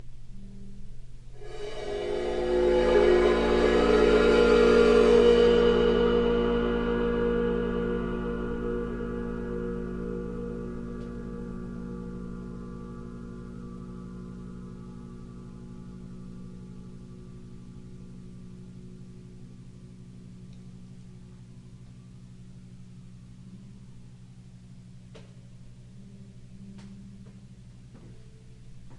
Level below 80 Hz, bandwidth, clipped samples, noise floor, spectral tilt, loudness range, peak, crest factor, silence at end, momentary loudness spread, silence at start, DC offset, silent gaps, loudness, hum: -42 dBFS; 10.5 kHz; under 0.1%; -48 dBFS; -6.5 dB/octave; 27 LU; -8 dBFS; 20 dB; 0 s; 28 LU; 0 s; under 0.1%; none; -25 LUFS; 60 Hz at -50 dBFS